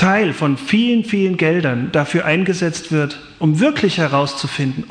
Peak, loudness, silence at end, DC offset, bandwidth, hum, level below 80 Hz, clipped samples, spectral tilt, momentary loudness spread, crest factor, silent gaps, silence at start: -2 dBFS; -17 LUFS; 0.05 s; under 0.1%; 10 kHz; none; -52 dBFS; under 0.1%; -6 dB/octave; 5 LU; 14 dB; none; 0 s